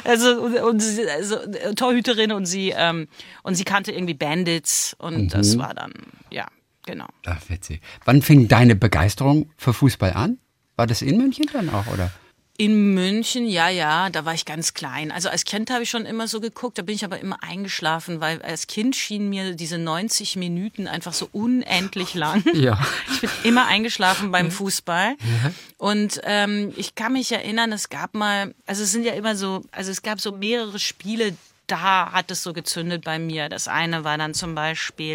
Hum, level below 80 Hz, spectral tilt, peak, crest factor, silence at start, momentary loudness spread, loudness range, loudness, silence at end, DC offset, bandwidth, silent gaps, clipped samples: none; -50 dBFS; -4.5 dB/octave; -2 dBFS; 20 dB; 0 s; 11 LU; 7 LU; -21 LUFS; 0 s; under 0.1%; 16.5 kHz; none; under 0.1%